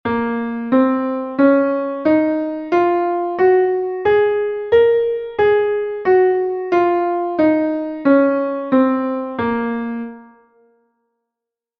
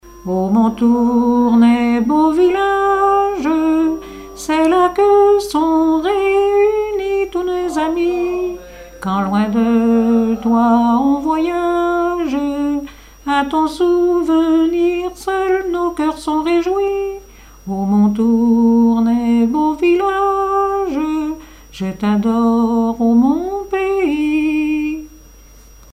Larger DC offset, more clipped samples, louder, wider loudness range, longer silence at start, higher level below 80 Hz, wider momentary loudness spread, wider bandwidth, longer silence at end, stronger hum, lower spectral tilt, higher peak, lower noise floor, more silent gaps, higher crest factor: neither; neither; about the same, -17 LUFS vs -15 LUFS; about the same, 3 LU vs 3 LU; about the same, 0.05 s vs 0.05 s; second, -54 dBFS vs -42 dBFS; about the same, 7 LU vs 9 LU; second, 5.6 kHz vs 14.5 kHz; first, 1.55 s vs 0.85 s; neither; first, -8 dB/octave vs -6.5 dB/octave; about the same, -2 dBFS vs -2 dBFS; first, -84 dBFS vs -41 dBFS; neither; about the same, 16 dB vs 12 dB